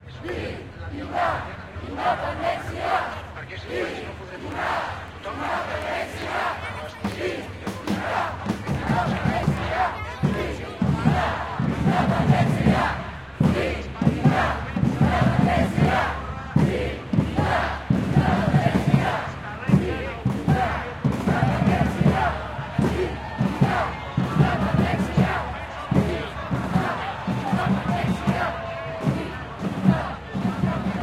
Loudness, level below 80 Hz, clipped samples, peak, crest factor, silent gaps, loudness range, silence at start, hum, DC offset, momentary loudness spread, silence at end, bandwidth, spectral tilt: -24 LUFS; -40 dBFS; under 0.1%; -4 dBFS; 20 dB; none; 6 LU; 0 s; none; under 0.1%; 11 LU; 0 s; 13.5 kHz; -7 dB/octave